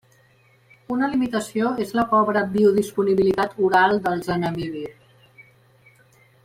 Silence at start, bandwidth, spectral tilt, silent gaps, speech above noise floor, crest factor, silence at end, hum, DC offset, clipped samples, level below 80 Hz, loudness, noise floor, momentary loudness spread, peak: 0.9 s; 16 kHz; -6 dB/octave; none; 37 dB; 18 dB; 1.55 s; none; under 0.1%; under 0.1%; -56 dBFS; -21 LUFS; -57 dBFS; 11 LU; -4 dBFS